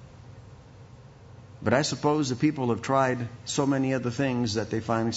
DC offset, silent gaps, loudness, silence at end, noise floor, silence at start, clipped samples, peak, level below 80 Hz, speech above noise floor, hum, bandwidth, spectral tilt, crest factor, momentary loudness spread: under 0.1%; none; -27 LUFS; 0 s; -49 dBFS; 0 s; under 0.1%; -8 dBFS; -58 dBFS; 23 dB; none; 8 kHz; -5.5 dB/octave; 18 dB; 5 LU